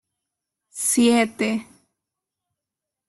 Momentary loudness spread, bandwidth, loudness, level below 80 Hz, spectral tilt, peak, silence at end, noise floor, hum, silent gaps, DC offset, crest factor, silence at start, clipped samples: 12 LU; 12.5 kHz; -20 LUFS; -66 dBFS; -3 dB/octave; -6 dBFS; 1.45 s; -86 dBFS; none; none; under 0.1%; 18 dB; 0.75 s; under 0.1%